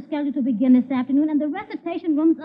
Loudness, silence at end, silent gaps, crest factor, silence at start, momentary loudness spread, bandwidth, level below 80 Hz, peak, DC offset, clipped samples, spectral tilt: -21 LUFS; 0 s; none; 14 dB; 0 s; 10 LU; 5 kHz; -70 dBFS; -8 dBFS; under 0.1%; under 0.1%; -10 dB/octave